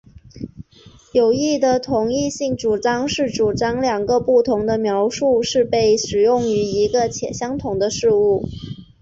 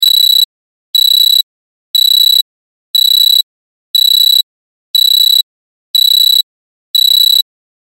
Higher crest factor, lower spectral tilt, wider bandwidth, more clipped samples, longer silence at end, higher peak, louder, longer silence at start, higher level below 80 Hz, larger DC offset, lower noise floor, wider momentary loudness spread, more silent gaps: about the same, 14 dB vs 10 dB; first, -4.5 dB/octave vs 8 dB/octave; second, 8 kHz vs 17 kHz; neither; second, 0.2 s vs 0.5 s; second, -4 dBFS vs 0 dBFS; second, -18 LUFS vs -7 LUFS; first, 0.35 s vs 0 s; first, -46 dBFS vs -82 dBFS; neither; second, -47 dBFS vs under -90 dBFS; second, 8 LU vs 11 LU; second, none vs 0.45-0.93 s, 1.43-1.94 s, 2.42-2.94 s, 3.43-3.94 s, 4.43-4.94 s, 5.43-5.94 s, 6.43-6.94 s